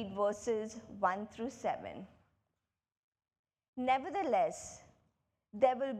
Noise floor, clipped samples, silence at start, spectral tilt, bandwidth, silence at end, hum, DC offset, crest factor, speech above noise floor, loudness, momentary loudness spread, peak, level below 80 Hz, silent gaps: -89 dBFS; under 0.1%; 0 s; -4.5 dB/octave; 12 kHz; 0 s; none; under 0.1%; 22 dB; 54 dB; -36 LUFS; 18 LU; -16 dBFS; -74 dBFS; 2.99-3.12 s, 3.39-3.44 s, 3.68-3.73 s